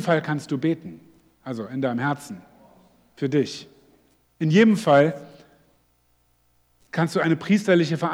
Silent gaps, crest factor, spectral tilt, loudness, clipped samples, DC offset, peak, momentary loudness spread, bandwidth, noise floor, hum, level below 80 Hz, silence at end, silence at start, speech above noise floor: none; 20 dB; -6.5 dB/octave; -22 LUFS; under 0.1%; under 0.1%; -4 dBFS; 20 LU; 19 kHz; -65 dBFS; 60 Hz at -55 dBFS; -70 dBFS; 0 s; 0 s; 43 dB